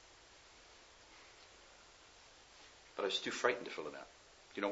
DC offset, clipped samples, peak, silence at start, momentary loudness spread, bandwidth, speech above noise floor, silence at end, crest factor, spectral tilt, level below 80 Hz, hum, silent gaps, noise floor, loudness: under 0.1%; under 0.1%; -18 dBFS; 0 s; 23 LU; 7.6 kHz; 22 dB; 0 s; 28 dB; -0.5 dB/octave; -76 dBFS; none; none; -62 dBFS; -40 LUFS